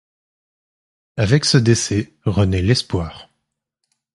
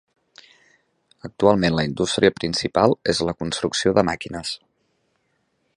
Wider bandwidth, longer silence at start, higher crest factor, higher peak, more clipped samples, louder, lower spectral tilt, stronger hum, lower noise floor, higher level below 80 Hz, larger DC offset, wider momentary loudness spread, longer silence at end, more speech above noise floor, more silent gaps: about the same, 11.5 kHz vs 11.5 kHz; about the same, 1.15 s vs 1.25 s; about the same, 20 dB vs 22 dB; about the same, 0 dBFS vs 0 dBFS; neither; first, -17 LUFS vs -21 LUFS; about the same, -5 dB/octave vs -4.5 dB/octave; neither; first, -76 dBFS vs -69 dBFS; first, -36 dBFS vs -48 dBFS; neither; about the same, 11 LU vs 11 LU; second, 0.95 s vs 1.2 s; first, 59 dB vs 49 dB; neither